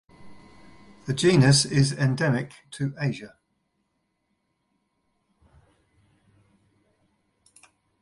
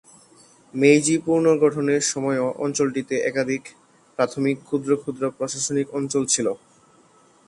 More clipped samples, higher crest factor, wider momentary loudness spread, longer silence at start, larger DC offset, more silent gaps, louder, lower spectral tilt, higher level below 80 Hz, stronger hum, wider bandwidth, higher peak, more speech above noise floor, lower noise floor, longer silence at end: neither; about the same, 22 dB vs 20 dB; first, 18 LU vs 9 LU; second, 0.2 s vs 0.75 s; neither; neither; about the same, -23 LUFS vs -22 LUFS; about the same, -5 dB/octave vs -4 dB/octave; first, -58 dBFS vs -66 dBFS; neither; about the same, 11.5 kHz vs 11.5 kHz; second, -6 dBFS vs -2 dBFS; first, 53 dB vs 34 dB; first, -75 dBFS vs -55 dBFS; first, 4.75 s vs 0.9 s